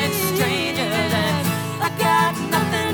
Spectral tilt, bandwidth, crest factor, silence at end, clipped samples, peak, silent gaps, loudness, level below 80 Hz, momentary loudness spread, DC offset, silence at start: -4 dB/octave; over 20 kHz; 14 dB; 0 s; under 0.1%; -6 dBFS; none; -20 LUFS; -58 dBFS; 5 LU; 0.1%; 0 s